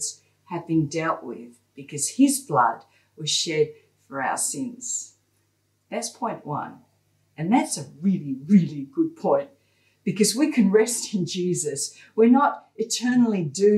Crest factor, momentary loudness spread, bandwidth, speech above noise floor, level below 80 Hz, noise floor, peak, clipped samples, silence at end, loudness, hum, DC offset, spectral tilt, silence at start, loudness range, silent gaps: 18 dB; 13 LU; 14.5 kHz; 46 dB; -72 dBFS; -69 dBFS; -6 dBFS; under 0.1%; 0 s; -23 LUFS; none; under 0.1%; -4.5 dB/octave; 0 s; 7 LU; none